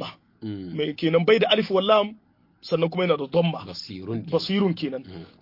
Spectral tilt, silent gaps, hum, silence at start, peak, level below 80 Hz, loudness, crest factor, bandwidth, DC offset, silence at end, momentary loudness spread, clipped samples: -7 dB/octave; none; none; 0 s; -4 dBFS; -66 dBFS; -23 LUFS; 20 dB; 5.8 kHz; under 0.1%; 0.15 s; 17 LU; under 0.1%